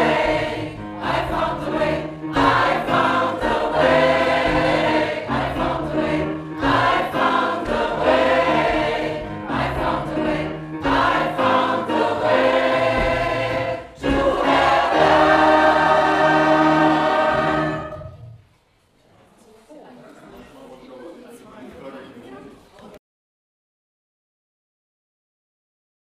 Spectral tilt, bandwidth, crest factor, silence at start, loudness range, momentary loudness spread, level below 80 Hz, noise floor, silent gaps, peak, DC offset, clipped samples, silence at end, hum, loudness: -5.5 dB/octave; 14 kHz; 18 dB; 0 s; 5 LU; 11 LU; -40 dBFS; -59 dBFS; none; -2 dBFS; under 0.1%; under 0.1%; 3.15 s; none; -19 LUFS